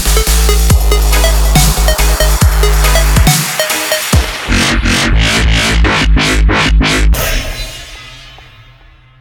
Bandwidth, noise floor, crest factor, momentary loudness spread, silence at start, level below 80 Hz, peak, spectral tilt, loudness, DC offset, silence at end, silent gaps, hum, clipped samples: over 20 kHz; -40 dBFS; 10 dB; 6 LU; 0 s; -12 dBFS; 0 dBFS; -3.5 dB/octave; -10 LUFS; under 0.1%; 0.8 s; none; none; under 0.1%